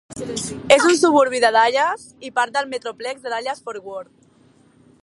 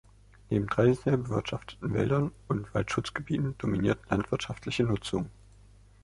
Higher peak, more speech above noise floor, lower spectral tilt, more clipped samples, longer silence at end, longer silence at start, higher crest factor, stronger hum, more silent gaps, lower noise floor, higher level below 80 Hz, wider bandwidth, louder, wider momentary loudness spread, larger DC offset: first, 0 dBFS vs -10 dBFS; first, 35 dB vs 27 dB; second, -2.5 dB/octave vs -7 dB/octave; neither; first, 1 s vs 0.7 s; second, 0.1 s vs 0.5 s; about the same, 20 dB vs 20 dB; neither; neither; about the same, -54 dBFS vs -56 dBFS; second, -58 dBFS vs -50 dBFS; about the same, 11.5 kHz vs 11.5 kHz; first, -18 LUFS vs -30 LUFS; first, 16 LU vs 9 LU; neither